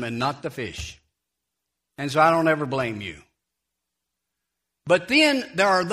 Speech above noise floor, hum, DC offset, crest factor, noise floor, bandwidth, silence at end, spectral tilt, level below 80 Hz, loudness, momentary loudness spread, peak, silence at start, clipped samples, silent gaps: 60 dB; none; under 0.1%; 20 dB; -82 dBFS; 15.5 kHz; 0 s; -4.5 dB/octave; -54 dBFS; -22 LUFS; 17 LU; -4 dBFS; 0 s; under 0.1%; none